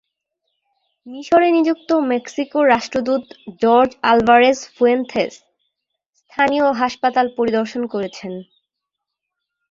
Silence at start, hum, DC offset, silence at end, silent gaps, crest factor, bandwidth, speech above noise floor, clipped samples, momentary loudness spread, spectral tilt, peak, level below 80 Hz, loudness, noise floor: 1.05 s; none; under 0.1%; 1.3 s; none; 18 dB; 7.6 kHz; 64 dB; under 0.1%; 15 LU; -4.5 dB/octave; -2 dBFS; -58 dBFS; -17 LUFS; -81 dBFS